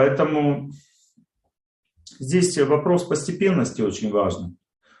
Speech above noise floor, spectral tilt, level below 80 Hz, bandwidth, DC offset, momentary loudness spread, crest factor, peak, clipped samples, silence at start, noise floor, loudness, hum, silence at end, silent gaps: 43 dB; -6 dB/octave; -60 dBFS; 12 kHz; under 0.1%; 14 LU; 18 dB; -4 dBFS; under 0.1%; 0 s; -64 dBFS; -21 LUFS; none; 0.45 s; 1.66-1.83 s